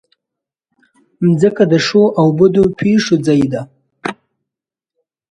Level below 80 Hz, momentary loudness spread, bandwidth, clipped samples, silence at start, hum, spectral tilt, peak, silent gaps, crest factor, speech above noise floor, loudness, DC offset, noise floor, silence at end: -50 dBFS; 15 LU; 10.5 kHz; under 0.1%; 1.2 s; none; -6.5 dB/octave; 0 dBFS; none; 14 dB; 73 dB; -13 LUFS; under 0.1%; -85 dBFS; 1.15 s